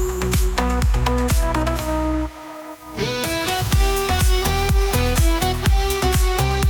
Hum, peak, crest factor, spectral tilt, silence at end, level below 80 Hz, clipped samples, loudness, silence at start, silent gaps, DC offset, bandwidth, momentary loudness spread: none; -4 dBFS; 14 dB; -4.5 dB/octave; 0 s; -22 dBFS; under 0.1%; -20 LUFS; 0 s; none; under 0.1%; 19.5 kHz; 7 LU